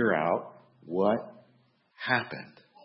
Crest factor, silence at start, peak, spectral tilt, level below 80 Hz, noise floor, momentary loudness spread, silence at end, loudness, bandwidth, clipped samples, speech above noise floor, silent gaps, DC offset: 22 dB; 0 s; -10 dBFS; -9.5 dB/octave; -76 dBFS; -66 dBFS; 21 LU; 0.35 s; -30 LUFS; 5.8 kHz; under 0.1%; 37 dB; none; under 0.1%